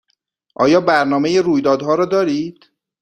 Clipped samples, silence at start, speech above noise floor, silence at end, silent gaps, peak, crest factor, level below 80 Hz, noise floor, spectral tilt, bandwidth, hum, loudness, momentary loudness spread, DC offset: under 0.1%; 0.6 s; 53 dB; 0.5 s; none; 0 dBFS; 16 dB; -58 dBFS; -68 dBFS; -5.5 dB/octave; 9.8 kHz; none; -15 LUFS; 6 LU; under 0.1%